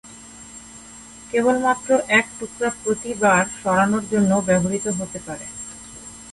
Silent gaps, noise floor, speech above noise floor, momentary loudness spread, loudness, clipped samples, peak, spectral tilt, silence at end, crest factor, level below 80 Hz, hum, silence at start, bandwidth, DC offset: none; -42 dBFS; 22 dB; 21 LU; -20 LUFS; under 0.1%; -4 dBFS; -4.5 dB/octave; 0 s; 18 dB; -52 dBFS; none; 0.05 s; 11.5 kHz; under 0.1%